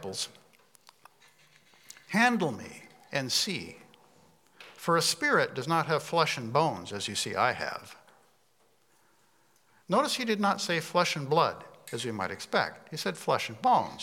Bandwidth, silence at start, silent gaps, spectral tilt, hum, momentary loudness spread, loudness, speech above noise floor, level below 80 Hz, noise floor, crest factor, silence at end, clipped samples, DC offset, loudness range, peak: 17.5 kHz; 0 s; none; -3.5 dB/octave; none; 11 LU; -29 LUFS; 40 dB; -78 dBFS; -69 dBFS; 22 dB; 0 s; under 0.1%; under 0.1%; 5 LU; -10 dBFS